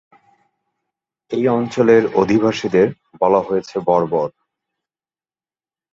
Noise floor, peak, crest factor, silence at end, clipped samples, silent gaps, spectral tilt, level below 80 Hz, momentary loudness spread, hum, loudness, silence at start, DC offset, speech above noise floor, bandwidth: under -90 dBFS; -2 dBFS; 18 dB; 1.65 s; under 0.1%; none; -7 dB/octave; -56 dBFS; 8 LU; none; -17 LUFS; 1.3 s; under 0.1%; over 74 dB; 7.6 kHz